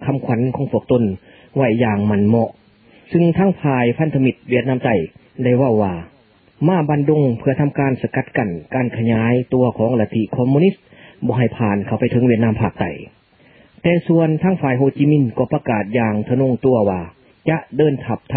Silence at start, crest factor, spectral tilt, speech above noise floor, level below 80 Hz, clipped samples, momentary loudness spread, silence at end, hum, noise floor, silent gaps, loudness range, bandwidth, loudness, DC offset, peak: 0 s; 16 dB; -13.5 dB/octave; 34 dB; -46 dBFS; under 0.1%; 7 LU; 0 s; none; -50 dBFS; none; 1 LU; 4.5 kHz; -17 LUFS; under 0.1%; 0 dBFS